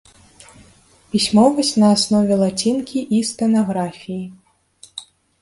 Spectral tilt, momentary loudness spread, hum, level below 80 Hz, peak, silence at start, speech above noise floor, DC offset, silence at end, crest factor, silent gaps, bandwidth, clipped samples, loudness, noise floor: -5 dB/octave; 21 LU; none; -54 dBFS; -2 dBFS; 1.15 s; 34 dB; under 0.1%; 0.4 s; 16 dB; none; 11.5 kHz; under 0.1%; -17 LUFS; -51 dBFS